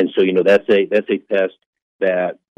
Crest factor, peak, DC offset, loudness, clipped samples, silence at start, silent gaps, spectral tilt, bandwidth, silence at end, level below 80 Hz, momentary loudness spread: 14 dB; -2 dBFS; under 0.1%; -17 LUFS; under 0.1%; 0 s; 1.66-1.73 s, 1.82-1.99 s; -7 dB/octave; 7.6 kHz; 0.25 s; -64 dBFS; 8 LU